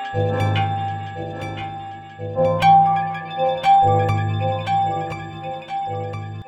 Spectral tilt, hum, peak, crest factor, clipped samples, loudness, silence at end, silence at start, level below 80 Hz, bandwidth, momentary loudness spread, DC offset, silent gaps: -7 dB/octave; none; -4 dBFS; 16 dB; under 0.1%; -20 LUFS; 0 s; 0 s; -50 dBFS; 9 kHz; 16 LU; under 0.1%; none